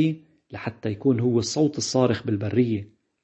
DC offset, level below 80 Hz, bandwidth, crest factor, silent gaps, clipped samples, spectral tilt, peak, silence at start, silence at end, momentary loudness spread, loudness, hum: under 0.1%; -60 dBFS; 8.6 kHz; 18 dB; none; under 0.1%; -6 dB/octave; -6 dBFS; 0 s; 0.4 s; 12 LU; -24 LUFS; none